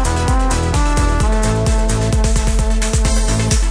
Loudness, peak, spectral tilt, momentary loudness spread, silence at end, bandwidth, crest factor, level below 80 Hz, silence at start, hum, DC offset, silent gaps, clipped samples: -16 LUFS; -2 dBFS; -5 dB/octave; 1 LU; 0 s; 11 kHz; 12 dB; -16 dBFS; 0 s; none; under 0.1%; none; under 0.1%